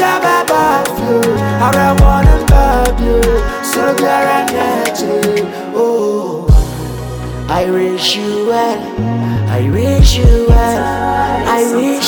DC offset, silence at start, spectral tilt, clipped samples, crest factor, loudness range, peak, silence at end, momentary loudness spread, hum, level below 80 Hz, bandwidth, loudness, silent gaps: under 0.1%; 0 s; -5.5 dB/octave; under 0.1%; 12 dB; 4 LU; 0 dBFS; 0 s; 7 LU; none; -16 dBFS; 20 kHz; -13 LUFS; none